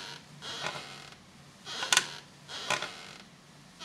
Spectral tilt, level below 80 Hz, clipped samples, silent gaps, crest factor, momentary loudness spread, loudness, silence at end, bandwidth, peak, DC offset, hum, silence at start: 0 dB/octave; -74 dBFS; under 0.1%; none; 32 dB; 26 LU; -32 LUFS; 0 s; 16 kHz; -4 dBFS; under 0.1%; none; 0 s